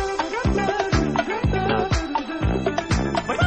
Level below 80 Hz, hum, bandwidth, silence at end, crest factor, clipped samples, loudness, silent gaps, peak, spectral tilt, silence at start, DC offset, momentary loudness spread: -30 dBFS; none; 9.4 kHz; 0 s; 16 dB; under 0.1%; -23 LUFS; none; -6 dBFS; -6 dB/octave; 0 s; 0.2%; 3 LU